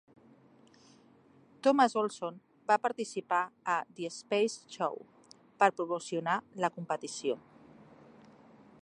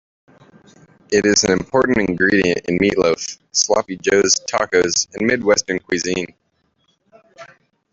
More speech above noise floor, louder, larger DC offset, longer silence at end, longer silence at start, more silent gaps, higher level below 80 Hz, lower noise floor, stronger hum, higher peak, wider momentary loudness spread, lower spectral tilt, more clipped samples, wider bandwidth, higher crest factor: second, 30 dB vs 47 dB; second, -32 LUFS vs -17 LUFS; neither; first, 1.45 s vs 0.5 s; first, 1.65 s vs 1.1 s; neither; second, -84 dBFS vs -50 dBFS; about the same, -62 dBFS vs -64 dBFS; neither; second, -10 dBFS vs 0 dBFS; first, 13 LU vs 6 LU; about the same, -4 dB/octave vs -3 dB/octave; neither; first, 11 kHz vs 7.8 kHz; first, 24 dB vs 18 dB